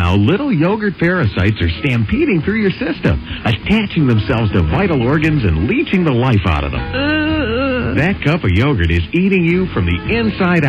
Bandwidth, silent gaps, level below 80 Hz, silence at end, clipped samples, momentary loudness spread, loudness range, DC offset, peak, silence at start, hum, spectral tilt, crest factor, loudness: 7.8 kHz; none; -28 dBFS; 0 s; under 0.1%; 4 LU; 1 LU; under 0.1%; -4 dBFS; 0 s; none; -8.5 dB/octave; 10 dB; -15 LUFS